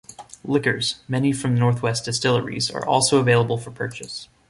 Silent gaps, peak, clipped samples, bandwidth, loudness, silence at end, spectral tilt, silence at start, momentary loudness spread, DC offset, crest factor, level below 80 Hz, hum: none; -4 dBFS; under 0.1%; 11.5 kHz; -21 LUFS; 0.25 s; -4.5 dB/octave; 0.1 s; 13 LU; under 0.1%; 18 dB; -56 dBFS; none